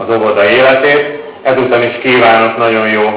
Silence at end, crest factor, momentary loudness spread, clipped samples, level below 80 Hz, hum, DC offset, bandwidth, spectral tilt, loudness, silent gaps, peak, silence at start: 0 s; 10 dB; 6 LU; under 0.1%; -52 dBFS; none; under 0.1%; 4 kHz; -8.5 dB/octave; -9 LUFS; none; 0 dBFS; 0 s